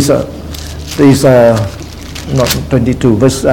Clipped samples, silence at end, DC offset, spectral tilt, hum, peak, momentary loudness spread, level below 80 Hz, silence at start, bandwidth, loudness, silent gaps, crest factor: 0.8%; 0 s; 0.8%; -6 dB/octave; none; 0 dBFS; 17 LU; -28 dBFS; 0 s; 18.5 kHz; -10 LUFS; none; 10 dB